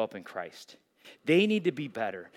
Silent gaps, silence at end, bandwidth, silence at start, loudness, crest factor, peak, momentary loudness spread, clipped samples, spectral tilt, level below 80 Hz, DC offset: none; 0.1 s; 14 kHz; 0 s; -30 LUFS; 18 dB; -12 dBFS; 17 LU; under 0.1%; -6 dB/octave; -86 dBFS; under 0.1%